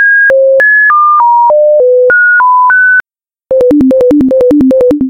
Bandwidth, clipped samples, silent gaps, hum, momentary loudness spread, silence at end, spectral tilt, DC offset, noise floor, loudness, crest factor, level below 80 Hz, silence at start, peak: 5.8 kHz; under 0.1%; none; none; 3 LU; 0 s; -7.5 dB/octave; under 0.1%; -57 dBFS; -5 LUFS; 4 dB; -38 dBFS; 0 s; 0 dBFS